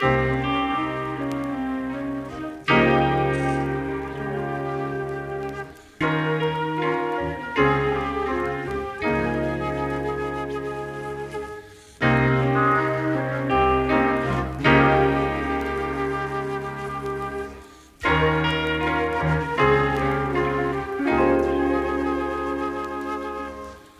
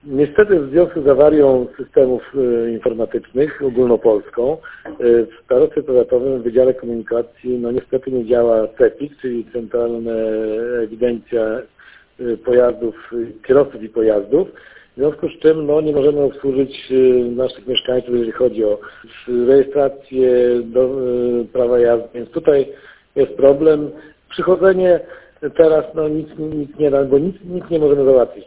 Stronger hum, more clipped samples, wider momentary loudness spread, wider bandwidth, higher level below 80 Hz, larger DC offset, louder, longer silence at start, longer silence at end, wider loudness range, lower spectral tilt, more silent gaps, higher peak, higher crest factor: neither; neither; about the same, 11 LU vs 11 LU; first, 14 kHz vs 4 kHz; first, -40 dBFS vs -48 dBFS; neither; second, -23 LUFS vs -16 LUFS; about the same, 0 s vs 0.05 s; about the same, 0.1 s vs 0.05 s; about the same, 5 LU vs 3 LU; second, -7 dB/octave vs -10.5 dB/octave; neither; second, -4 dBFS vs 0 dBFS; about the same, 18 dB vs 16 dB